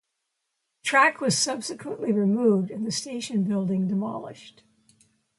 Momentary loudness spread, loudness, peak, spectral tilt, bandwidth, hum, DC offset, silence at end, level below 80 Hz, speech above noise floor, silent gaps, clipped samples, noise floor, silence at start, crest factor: 13 LU; -25 LUFS; -6 dBFS; -4 dB/octave; 11.5 kHz; none; under 0.1%; 0.9 s; -72 dBFS; 55 dB; none; under 0.1%; -80 dBFS; 0.85 s; 20 dB